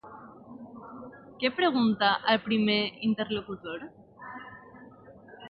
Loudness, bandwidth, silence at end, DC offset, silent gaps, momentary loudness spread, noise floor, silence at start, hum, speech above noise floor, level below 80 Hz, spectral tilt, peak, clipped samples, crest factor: -27 LUFS; 5.4 kHz; 0 s; under 0.1%; none; 23 LU; -51 dBFS; 0.05 s; none; 24 dB; -66 dBFS; -9 dB/octave; -10 dBFS; under 0.1%; 20 dB